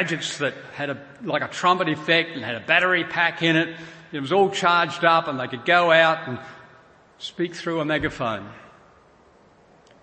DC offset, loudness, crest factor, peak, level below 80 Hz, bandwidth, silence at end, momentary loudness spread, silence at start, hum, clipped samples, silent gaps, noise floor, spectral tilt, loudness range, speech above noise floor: under 0.1%; -21 LUFS; 22 dB; -2 dBFS; -58 dBFS; 8.8 kHz; 1.35 s; 15 LU; 0 s; none; under 0.1%; none; -54 dBFS; -4.5 dB/octave; 10 LU; 32 dB